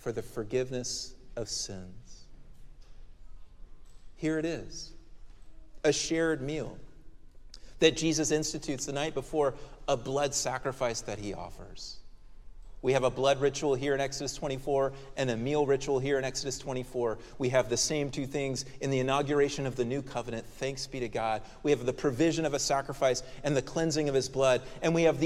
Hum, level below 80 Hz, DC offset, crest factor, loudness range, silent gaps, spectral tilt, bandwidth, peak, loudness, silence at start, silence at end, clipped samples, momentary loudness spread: none; -50 dBFS; under 0.1%; 22 dB; 9 LU; none; -4 dB/octave; 14.5 kHz; -10 dBFS; -31 LUFS; 0 s; 0 s; under 0.1%; 11 LU